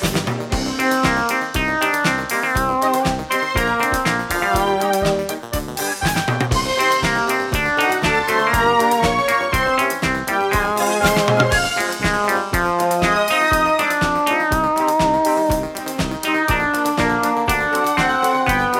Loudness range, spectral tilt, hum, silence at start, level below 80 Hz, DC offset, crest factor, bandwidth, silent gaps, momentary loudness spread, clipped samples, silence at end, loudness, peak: 2 LU; -4 dB/octave; none; 0 s; -34 dBFS; under 0.1%; 18 dB; 18.5 kHz; none; 5 LU; under 0.1%; 0 s; -18 LUFS; -2 dBFS